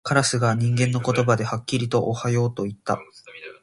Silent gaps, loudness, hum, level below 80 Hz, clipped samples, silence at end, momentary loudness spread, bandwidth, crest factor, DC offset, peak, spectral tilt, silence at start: none; -23 LUFS; none; -56 dBFS; under 0.1%; 0.1 s; 9 LU; 11.5 kHz; 20 dB; under 0.1%; -4 dBFS; -5.5 dB/octave; 0.05 s